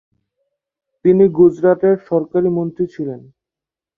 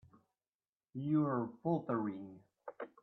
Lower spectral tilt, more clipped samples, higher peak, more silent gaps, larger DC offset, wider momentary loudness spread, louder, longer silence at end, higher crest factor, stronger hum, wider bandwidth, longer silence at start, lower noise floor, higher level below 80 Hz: about the same, -11 dB/octave vs -11 dB/octave; neither; first, -2 dBFS vs -22 dBFS; neither; neither; second, 13 LU vs 20 LU; first, -15 LUFS vs -37 LUFS; first, 0.8 s vs 0.15 s; about the same, 14 dB vs 18 dB; neither; about the same, 3.8 kHz vs 4.1 kHz; about the same, 1.05 s vs 0.95 s; about the same, -88 dBFS vs under -90 dBFS; first, -56 dBFS vs -82 dBFS